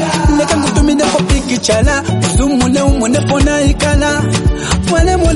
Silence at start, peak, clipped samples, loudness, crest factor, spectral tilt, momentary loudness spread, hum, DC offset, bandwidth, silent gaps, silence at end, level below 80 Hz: 0 s; 0 dBFS; under 0.1%; -12 LUFS; 12 dB; -5 dB/octave; 2 LU; none; under 0.1%; 11.5 kHz; none; 0 s; -18 dBFS